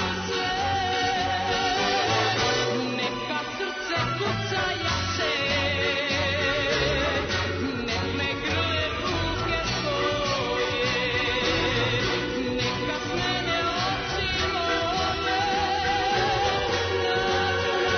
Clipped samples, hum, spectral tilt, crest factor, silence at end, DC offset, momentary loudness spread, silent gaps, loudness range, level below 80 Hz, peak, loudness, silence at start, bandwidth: under 0.1%; none; -4 dB/octave; 14 dB; 0 s; under 0.1%; 4 LU; none; 1 LU; -44 dBFS; -12 dBFS; -25 LUFS; 0 s; 6.6 kHz